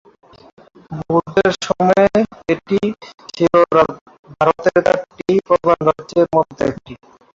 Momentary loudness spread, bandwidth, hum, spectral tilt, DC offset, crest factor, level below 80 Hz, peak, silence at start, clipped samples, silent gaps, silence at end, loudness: 9 LU; 7.8 kHz; none; -6 dB/octave; under 0.1%; 16 dB; -50 dBFS; -2 dBFS; 0.9 s; under 0.1%; 4.01-4.06 s, 4.19-4.23 s; 0.4 s; -16 LUFS